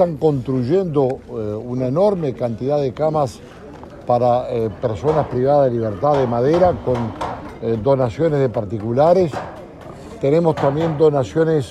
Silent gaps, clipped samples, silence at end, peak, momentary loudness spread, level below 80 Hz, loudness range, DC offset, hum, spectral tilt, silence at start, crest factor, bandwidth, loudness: none; under 0.1%; 0 s; -2 dBFS; 12 LU; -46 dBFS; 3 LU; under 0.1%; none; -8.5 dB/octave; 0 s; 16 dB; 11 kHz; -18 LUFS